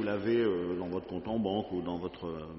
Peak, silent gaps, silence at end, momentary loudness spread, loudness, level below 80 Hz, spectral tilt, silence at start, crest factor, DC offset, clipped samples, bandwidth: -18 dBFS; none; 0 s; 9 LU; -33 LUFS; -60 dBFS; -5.5 dB/octave; 0 s; 14 dB; under 0.1%; under 0.1%; 5.8 kHz